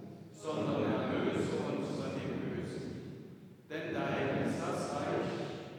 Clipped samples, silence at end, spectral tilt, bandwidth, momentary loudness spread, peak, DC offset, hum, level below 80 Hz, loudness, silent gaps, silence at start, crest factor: under 0.1%; 0 s; -6.5 dB/octave; 19.5 kHz; 12 LU; -20 dBFS; under 0.1%; none; -70 dBFS; -36 LUFS; none; 0 s; 16 dB